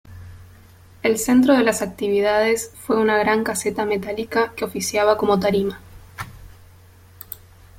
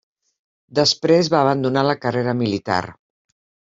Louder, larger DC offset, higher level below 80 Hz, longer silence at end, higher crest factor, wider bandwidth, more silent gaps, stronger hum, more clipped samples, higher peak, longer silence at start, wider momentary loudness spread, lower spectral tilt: about the same, -20 LUFS vs -19 LUFS; neither; first, -50 dBFS vs -60 dBFS; second, 0.45 s vs 0.8 s; about the same, 20 dB vs 18 dB; first, 16.5 kHz vs 7.8 kHz; neither; neither; neither; about the same, -2 dBFS vs -2 dBFS; second, 0.05 s vs 0.75 s; first, 19 LU vs 8 LU; about the same, -4.5 dB/octave vs -5 dB/octave